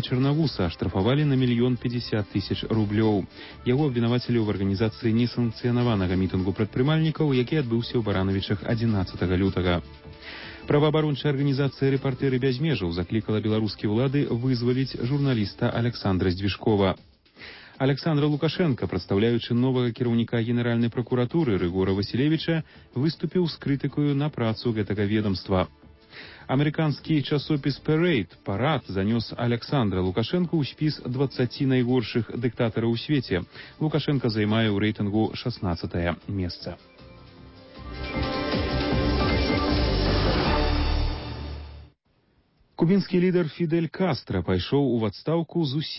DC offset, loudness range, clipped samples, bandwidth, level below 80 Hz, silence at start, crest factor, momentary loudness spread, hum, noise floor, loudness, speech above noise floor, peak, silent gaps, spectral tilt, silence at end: under 0.1%; 2 LU; under 0.1%; 5.8 kHz; -38 dBFS; 0 s; 14 dB; 7 LU; none; -66 dBFS; -25 LUFS; 41 dB; -10 dBFS; none; -11 dB/octave; 0 s